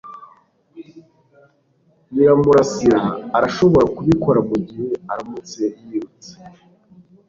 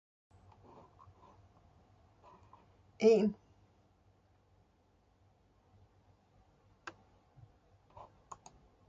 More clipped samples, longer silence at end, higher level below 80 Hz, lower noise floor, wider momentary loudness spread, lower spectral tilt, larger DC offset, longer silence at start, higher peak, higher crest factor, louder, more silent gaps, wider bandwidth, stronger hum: neither; second, 0.8 s vs 2 s; first, -48 dBFS vs -72 dBFS; second, -59 dBFS vs -71 dBFS; second, 15 LU vs 30 LU; about the same, -7 dB/octave vs -6 dB/octave; neither; second, 0.05 s vs 3 s; first, -2 dBFS vs -16 dBFS; second, 16 dB vs 26 dB; first, -17 LUFS vs -30 LUFS; neither; about the same, 7.6 kHz vs 7.4 kHz; neither